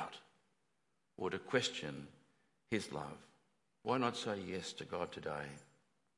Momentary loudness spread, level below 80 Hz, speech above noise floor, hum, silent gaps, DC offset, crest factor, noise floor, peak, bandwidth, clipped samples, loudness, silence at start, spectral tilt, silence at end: 15 LU; -78 dBFS; 43 dB; none; none; under 0.1%; 24 dB; -84 dBFS; -18 dBFS; 11.5 kHz; under 0.1%; -41 LUFS; 0 s; -4 dB/octave; 0.55 s